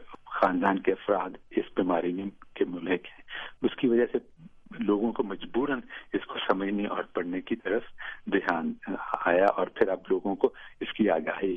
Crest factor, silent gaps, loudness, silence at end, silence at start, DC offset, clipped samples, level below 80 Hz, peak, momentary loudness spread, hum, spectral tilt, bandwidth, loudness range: 20 dB; none; -29 LUFS; 0 s; 0 s; under 0.1%; under 0.1%; -60 dBFS; -8 dBFS; 11 LU; none; -8 dB/octave; 6 kHz; 3 LU